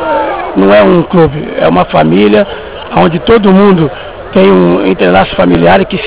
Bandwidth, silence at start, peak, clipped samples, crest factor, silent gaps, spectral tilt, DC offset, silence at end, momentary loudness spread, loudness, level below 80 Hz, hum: 4 kHz; 0 s; 0 dBFS; 4%; 6 dB; none; -11 dB/octave; under 0.1%; 0 s; 8 LU; -7 LUFS; -32 dBFS; none